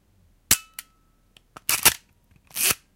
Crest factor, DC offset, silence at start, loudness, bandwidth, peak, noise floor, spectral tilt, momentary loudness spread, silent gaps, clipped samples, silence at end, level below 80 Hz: 26 dB; under 0.1%; 0.5 s; -21 LUFS; 17 kHz; -2 dBFS; -62 dBFS; 0.5 dB/octave; 20 LU; none; under 0.1%; 0.2 s; -52 dBFS